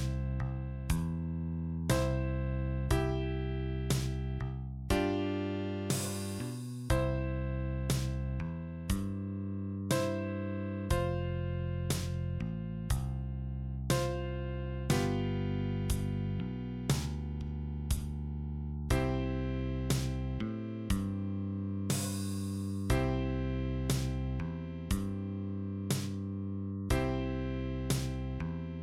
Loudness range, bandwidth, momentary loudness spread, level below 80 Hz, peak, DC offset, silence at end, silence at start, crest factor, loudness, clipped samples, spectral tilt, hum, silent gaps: 2 LU; 16 kHz; 7 LU; -40 dBFS; -16 dBFS; under 0.1%; 0 s; 0 s; 18 dB; -35 LUFS; under 0.1%; -6 dB/octave; none; none